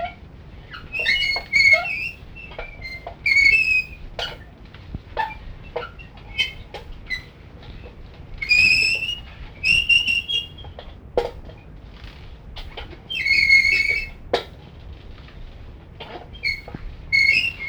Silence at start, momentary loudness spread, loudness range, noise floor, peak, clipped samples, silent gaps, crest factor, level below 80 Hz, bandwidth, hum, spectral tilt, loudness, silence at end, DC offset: 0 s; 25 LU; 12 LU; -41 dBFS; -4 dBFS; under 0.1%; none; 20 dB; -40 dBFS; over 20 kHz; none; -2 dB/octave; -18 LUFS; 0 s; under 0.1%